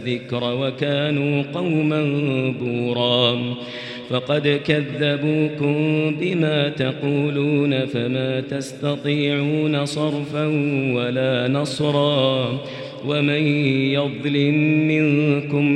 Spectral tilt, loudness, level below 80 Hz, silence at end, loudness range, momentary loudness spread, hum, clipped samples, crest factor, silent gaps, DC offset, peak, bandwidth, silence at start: -6.5 dB/octave; -20 LUFS; -62 dBFS; 0 s; 2 LU; 7 LU; none; under 0.1%; 18 dB; none; under 0.1%; -2 dBFS; 11 kHz; 0 s